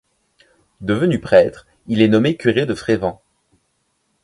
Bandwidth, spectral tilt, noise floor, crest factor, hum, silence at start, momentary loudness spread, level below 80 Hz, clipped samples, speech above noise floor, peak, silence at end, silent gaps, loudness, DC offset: 11.5 kHz; -7 dB/octave; -67 dBFS; 18 dB; none; 0.8 s; 9 LU; -50 dBFS; under 0.1%; 51 dB; 0 dBFS; 1.1 s; none; -17 LUFS; under 0.1%